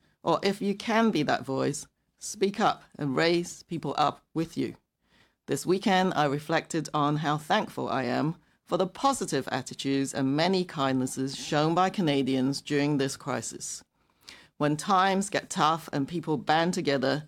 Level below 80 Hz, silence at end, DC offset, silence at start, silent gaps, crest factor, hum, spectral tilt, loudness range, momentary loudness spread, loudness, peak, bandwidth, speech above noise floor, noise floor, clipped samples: -66 dBFS; 0 s; under 0.1%; 0.25 s; none; 18 dB; none; -5 dB/octave; 2 LU; 9 LU; -28 LUFS; -10 dBFS; 16 kHz; 39 dB; -66 dBFS; under 0.1%